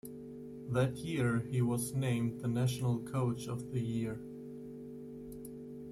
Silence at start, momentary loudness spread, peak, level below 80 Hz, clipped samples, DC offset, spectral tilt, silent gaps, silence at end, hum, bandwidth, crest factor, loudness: 0.05 s; 14 LU; -18 dBFS; -62 dBFS; under 0.1%; under 0.1%; -6.5 dB/octave; none; 0 s; none; 14.5 kHz; 18 dB; -35 LUFS